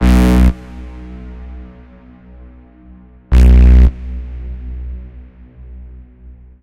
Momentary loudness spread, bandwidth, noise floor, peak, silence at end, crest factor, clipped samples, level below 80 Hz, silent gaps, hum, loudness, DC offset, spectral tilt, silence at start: 27 LU; 7.6 kHz; -40 dBFS; 0 dBFS; 0.85 s; 14 dB; under 0.1%; -14 dBFS; none; none; -11 LUFS; under 0.1%; -8 dB/octave; 0 s